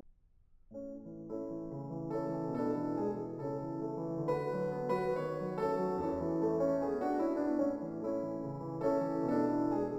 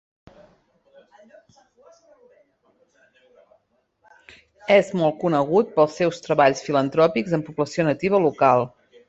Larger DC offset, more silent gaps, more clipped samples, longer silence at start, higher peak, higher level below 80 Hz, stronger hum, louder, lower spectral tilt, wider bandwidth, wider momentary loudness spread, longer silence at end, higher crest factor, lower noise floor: neither; neither; neither; second, 0.05 s vs 4.7 s; second, -20 dBFS vs -2 dBFS; about the same, -64 dBFS vs -64 dBFS; neither; second, -36 LUFS vs -20 LUFS; first, -9 dB/octave vs -6 dB/octave; first, 12 kHz vs 8.2 kHz; first, 10 LU vs 7 LU; second, 0 s vs 0.4 s; second, 14 dB vs 20 dB; about the same, -64 dBFS vs -67 dBFS